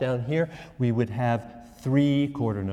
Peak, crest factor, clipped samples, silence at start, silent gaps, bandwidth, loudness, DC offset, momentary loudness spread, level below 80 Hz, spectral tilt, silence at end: -10 dBFS; 16 dB; under 0.1%; 0 s; none; 10 kHz; -26 LUFS; under 0.1%; 9 LU; -56 dBFS; -8.5 dB/octave; 0 s